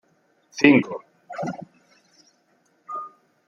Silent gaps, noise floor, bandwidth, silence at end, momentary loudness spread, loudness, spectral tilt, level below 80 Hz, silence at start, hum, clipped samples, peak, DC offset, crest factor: none; -65 dBFS; 7 kHz; 0.4 s; 23 LU; -22 LUFS; -5.5 dB/octave; -66 dBFS; 0.55 s; none; under 0.1%; -2 dBFS; under 0.1%; 24 dB